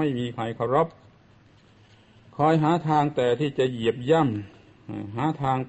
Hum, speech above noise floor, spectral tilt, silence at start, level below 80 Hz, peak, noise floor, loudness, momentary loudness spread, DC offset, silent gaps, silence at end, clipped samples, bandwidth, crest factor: none; 32 dB; -7.5 dB/octave; 0 s; -60 dBFS; -8 dBFS; -55 dBFS; -24 LUFS; 13 LU; under 0.1%; none; 0 s; under 0.1%; 8.4 kHz; 18 dB